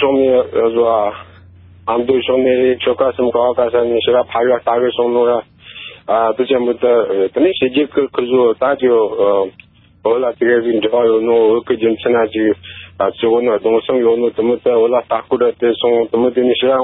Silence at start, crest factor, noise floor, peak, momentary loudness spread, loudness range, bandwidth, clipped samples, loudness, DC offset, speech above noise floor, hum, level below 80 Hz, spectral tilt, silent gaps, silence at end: 0 s; 12 dB; -41 dBFS; -2 dBFS; 5 LU; 1 LU; 4 kHz; under 0.1%; -14 LUFS; under 0.1%; 28 dB; none; -50 dBFS; -10.5 dB/octave; none; 0 s